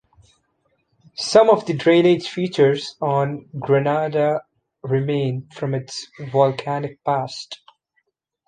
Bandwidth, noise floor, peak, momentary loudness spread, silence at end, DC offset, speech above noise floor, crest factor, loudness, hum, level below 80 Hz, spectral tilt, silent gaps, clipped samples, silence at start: 9.6 kHz; -70 dBFS; -2 dBFS; 15 LU; 0.95 s; under 0.1%; 51 dB; 18 dB; -20 LUFS; none; -64 dBFS; -6 dB/octave; none; under 0.1%; 1.2 s